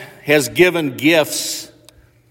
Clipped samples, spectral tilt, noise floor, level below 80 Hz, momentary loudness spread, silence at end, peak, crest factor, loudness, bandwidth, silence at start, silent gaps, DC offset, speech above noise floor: under 0.1%; -3.5 dB/octave; -49 dBFS; -56 dBFS; 9 LU; 0.65 s; 0 dBFS; 16 dB; -15 LUFS; 16.5 kHz; 0 s; none; under 0.1%; 34 dB